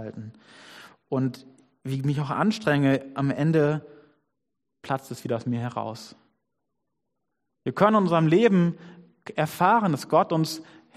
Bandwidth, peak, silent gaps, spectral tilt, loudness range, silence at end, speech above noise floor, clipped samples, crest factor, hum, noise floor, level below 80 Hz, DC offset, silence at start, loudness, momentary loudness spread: 14.5 kHz; -4 dBFS; none; -7 dB/octave; 12 LU; 0.35 s; 59 dB; under 0.1%; 22 dB; none; -83 dBFS; -68 dBFS; under 0.1%; 0 s; -24 LUFS; 16 LU